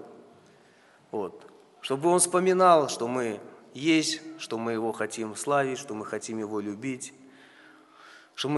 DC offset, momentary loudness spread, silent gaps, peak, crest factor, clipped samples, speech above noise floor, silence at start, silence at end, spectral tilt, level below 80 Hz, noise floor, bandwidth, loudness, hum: under 0.1%; 17 LU; none; -6 dBFS; 22 dB; under 0.1%; 32 dB; 0 s; 0 s; -3.5 dB/octave; -78 dBFS; -58 dBFS; 11.5 kHz; -27 LUFS; none